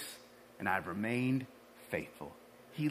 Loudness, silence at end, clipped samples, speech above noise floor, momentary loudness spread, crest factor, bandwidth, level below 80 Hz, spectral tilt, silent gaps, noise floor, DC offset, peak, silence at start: -37 LUFS; 0 s; under 0.1%; 19 dB; 20 LU; 22 dB; 15.5 kHz; -74 dBFS; -6 dB/octave; none; -56 dBFS; under 0.1%; -16 dBFS; 0 s